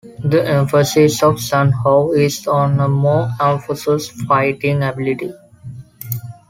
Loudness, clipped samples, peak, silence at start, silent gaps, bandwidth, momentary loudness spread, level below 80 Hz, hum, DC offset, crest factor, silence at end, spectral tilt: -16 LUFS; under 0.1%; -2 dBFS; 0.05 s; none; 16.5 kHz; 13 LU; -50 dBFS; none; under 0.1%; 14 dB; 0.15 s; -6 dB/octave